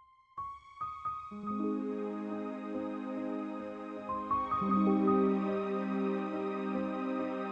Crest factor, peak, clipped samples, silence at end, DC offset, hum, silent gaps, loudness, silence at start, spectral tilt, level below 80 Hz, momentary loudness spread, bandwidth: 16 dB; -18 dBFS; under 0.1%; 0 s; under 0.1%; none; none; -35 LUFS; 0.35 s; -9 dB/octave; -66 dBFS; 13 LU; 6.6 kHz